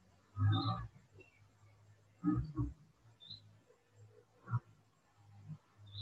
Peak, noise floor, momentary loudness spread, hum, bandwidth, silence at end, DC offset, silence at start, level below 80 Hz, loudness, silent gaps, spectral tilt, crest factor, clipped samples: -24 dBFS; -70 dBFS; 26 LU; none; 7.6 kHz; 0 s; under 0.1%; 0.35 s; -58 dBFS; -40 LUFS; none; -8 dB/octave; 18 dB; under 0.1%